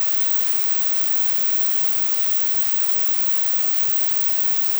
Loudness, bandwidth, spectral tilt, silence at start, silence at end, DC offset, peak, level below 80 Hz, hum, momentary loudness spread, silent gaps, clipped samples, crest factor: -10 LUFS; over 20 kHz; 0 dB/octave; 0 s; 0 s; under 0.1%; -2 dBFS; -56 dBFS; none; 0 LU; none; under 0.1%; 10 dB